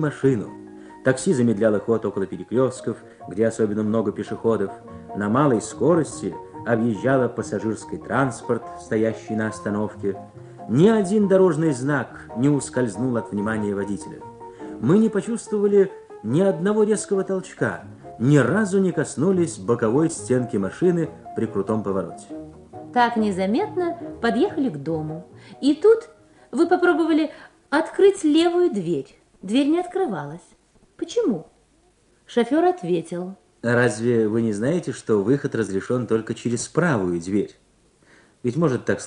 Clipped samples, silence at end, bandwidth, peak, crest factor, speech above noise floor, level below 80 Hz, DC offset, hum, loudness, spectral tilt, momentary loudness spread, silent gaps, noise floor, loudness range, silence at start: under 0.1%; 0 s; 10.5 kHz; -2 dBFS; 18 dB; 38 dB; -58 dBFS; under 0.1%; none; -22 LUFS; -6.5 dB/octave; 14 LU; none; -60 dBFS; 4 LU; 0 s